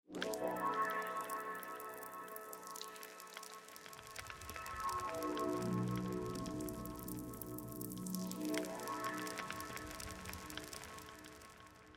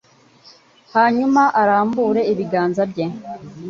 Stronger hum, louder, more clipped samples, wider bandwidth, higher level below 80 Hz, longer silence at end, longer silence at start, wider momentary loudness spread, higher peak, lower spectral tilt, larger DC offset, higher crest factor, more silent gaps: neither; second, -44 LUFS vs -17 LUFS; neither; first, 17 kHz vs 7.4 kHz; about the same, -64 dBFS vs -62 dBFS; about the same, 0 s vs 0 s; second, 0.1 s vs 0.95 s; about the same, 12 LU vs 11 LU; second, -22 dBFS vs -4 dBFS; second, -4.5 dB/octave vs -7 dB/octave; neither; first, 22 dB vs 16 dB; neither